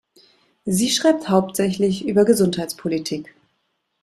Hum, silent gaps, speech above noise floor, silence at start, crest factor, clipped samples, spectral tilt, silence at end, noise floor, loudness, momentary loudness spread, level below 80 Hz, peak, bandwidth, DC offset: none; none; 53 dB; 0.65 s; 18 dB; under 0.1%; -5 dB/octave; 0.8 s; -72 dBFS; -19 LUFS; 10 LU; -58 dBFS; -2 dBFS; 15 kHz; under 0.1%